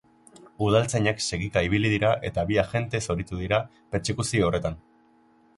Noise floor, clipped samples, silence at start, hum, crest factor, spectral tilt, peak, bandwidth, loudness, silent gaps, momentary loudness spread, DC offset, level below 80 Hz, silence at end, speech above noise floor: -59 dBFS; under 0.1%; 0.4 s; none; 18 dB; -5 dB/octave; -8 dBFS; 11.5 kHz; -25 LUFS; none; 8 LU; under 0.1%; -44 dBFS; 0.8 s; 35 dB